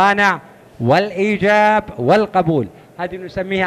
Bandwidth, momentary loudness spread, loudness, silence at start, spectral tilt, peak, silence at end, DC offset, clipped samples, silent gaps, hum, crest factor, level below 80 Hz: 14 kHz; 13 LU; -16 LUFS; 0 s; -6 dB/octave; -2 dBFS; 0 s; under 0.1%; under 0.1%; none; none; 14 dB; -48 dBFS